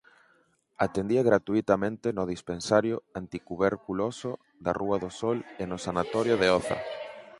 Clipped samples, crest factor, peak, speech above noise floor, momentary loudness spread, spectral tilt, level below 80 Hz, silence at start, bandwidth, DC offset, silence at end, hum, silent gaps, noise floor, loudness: under 0.1%; 22 dB; -6 dBFS; 39 dB; 13 LU; -5.5 dB/octave; -58 dBFS; 0.8 s; 11.5 kHz; under 0.1%; 0.1 s; none; none; -67 dBFS; -28 LUFS